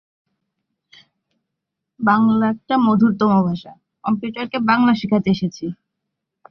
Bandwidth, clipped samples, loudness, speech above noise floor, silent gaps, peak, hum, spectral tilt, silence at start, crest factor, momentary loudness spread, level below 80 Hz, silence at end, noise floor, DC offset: 6.4 kHz; under 0.1%; -18 LUFS; 63 dB; none; -2 dBFS; none; -7.5 dB/octave; 2 s; 18 dB; 11 LU; -58 dBFS; 0.8 s; -80 dBFS; under 0.1%